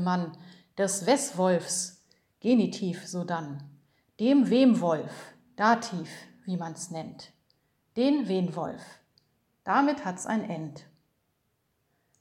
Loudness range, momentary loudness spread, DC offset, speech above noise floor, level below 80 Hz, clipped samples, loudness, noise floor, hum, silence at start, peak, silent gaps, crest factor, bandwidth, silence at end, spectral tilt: 6 LU; 19 LU; under 0.1%; 48 dB; -78 dBFS; under 0.1%; -28 LUFS; -75 dBFS; none; 0 s; -8 dBFS; none; 20 dB; 15 kHz; 1.4 s; -5 dB/octave